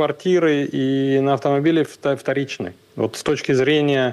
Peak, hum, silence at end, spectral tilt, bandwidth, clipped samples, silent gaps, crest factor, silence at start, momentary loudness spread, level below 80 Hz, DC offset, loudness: -8 dBFS; none; 0 s; -6 dB/octave; 12.5 kHz; under 0.1%; none; 10 dB; 0 s; 8 LU; -60 dBFS; under 0.1%; -19 LUFS